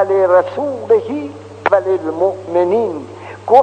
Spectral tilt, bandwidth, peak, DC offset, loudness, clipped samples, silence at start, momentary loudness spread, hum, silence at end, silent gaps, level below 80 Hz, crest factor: -7 dB/octave; 9 kHz; 0 dBFS; under 0.1%; -16 LUFS; 0.2%; 0 s; 15 LU; none; 0 s; none; -62 dBFS; 14 dB